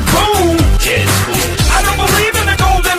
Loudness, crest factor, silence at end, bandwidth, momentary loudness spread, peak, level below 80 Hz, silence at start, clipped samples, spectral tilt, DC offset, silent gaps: -11 LUFS; 12 dB; 0 s; 16 kHz; 2 LU; 0 dBFS; -18 dBFS; 0 s; under 0.1%; -3.5 dB/octave; under 0.1%; none